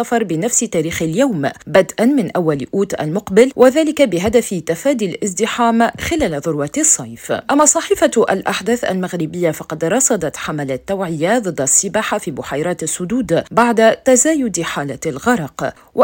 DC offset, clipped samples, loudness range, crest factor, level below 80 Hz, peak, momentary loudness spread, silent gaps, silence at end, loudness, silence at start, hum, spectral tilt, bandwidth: under 0.1%; under 0.1%; 2 LU; 16 dB; -48 dBFS; 0 dBFS; 10 LU; none; 0 s; -16 LUFS; 0 s; none; -4 dB/octave; 17 kHz